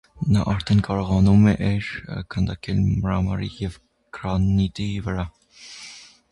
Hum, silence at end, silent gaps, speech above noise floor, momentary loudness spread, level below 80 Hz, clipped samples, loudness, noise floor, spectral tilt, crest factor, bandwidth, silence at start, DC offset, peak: none; 0.3 s; none; 23 dB; 19 LU; -36 dBFS; under 0.1%; -22 LUFS; -44 dBFS; -7.5 dB/octave; 16 dB; 11 kHz; 0.15 s; under 0.1%; -6 dBFS